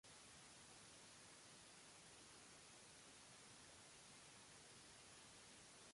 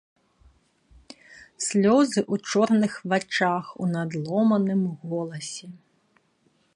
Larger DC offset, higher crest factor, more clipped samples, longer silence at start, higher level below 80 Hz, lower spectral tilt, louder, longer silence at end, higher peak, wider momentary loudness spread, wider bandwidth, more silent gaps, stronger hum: neither; about the same, 14 dB vs 18 dB; neither; second, 0.05 s vs 1.3 s; second, -84 dBFS vs -64 dBFS; second, -1.5 dB/octave vs -5.5 dB/octave; second, -62 LUFS vs -24 LUFS; second, 0 s vs 1 s; second, -50 dBFS vs -8 dBFS; second, 0 LU vs 12 LU; about the same, 11.5 kHz vs 11.5 kHz; neither; neither